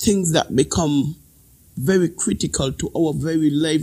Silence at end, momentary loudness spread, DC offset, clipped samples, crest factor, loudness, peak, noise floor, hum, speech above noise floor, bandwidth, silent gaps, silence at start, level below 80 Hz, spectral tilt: 0 s; 7 LU; under 0.1%; under 0.1%; 18 dB; -20 LUFS; -2 dBFS; -51 dBFS; none; 32 dB; 16 kHz; none; 0 s; -42 dBFS; -5 dB/octave